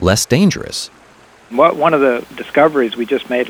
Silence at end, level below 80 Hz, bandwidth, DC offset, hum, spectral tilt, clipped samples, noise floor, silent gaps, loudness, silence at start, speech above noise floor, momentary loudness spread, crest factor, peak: 0 s; -42 dBFS; over 20 kHz; under 0.1%; none; -5 dB/octave; under 0.1%; -45 dBFS; none; -15 LUFS; 0 s; 31 dB; 11 LU; 14 dB; 0 dBFS